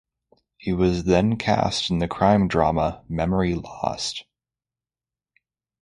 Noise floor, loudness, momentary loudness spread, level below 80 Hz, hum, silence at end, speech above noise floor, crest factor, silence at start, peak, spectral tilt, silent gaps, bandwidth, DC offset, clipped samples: under -90 dBFS; -22 LUFS; 9 LU; -42 dBFS; none; 1.6 s; over 68 dB; 20 dB; 0.65 s; -4 dBFS; -6 dB/octave; none; 11.5 kHz; under 0.1%; under 0.1%